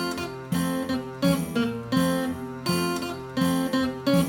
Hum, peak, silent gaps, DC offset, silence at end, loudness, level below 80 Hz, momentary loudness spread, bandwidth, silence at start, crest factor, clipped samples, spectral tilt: none; -10 dBFS; none; under 0.1%; 0 s; -26 LUFS; -52 dBFS; 7 LU; over 20 kHz; 0 s; 16 dB; under 0.1%; -5.5 dB/octave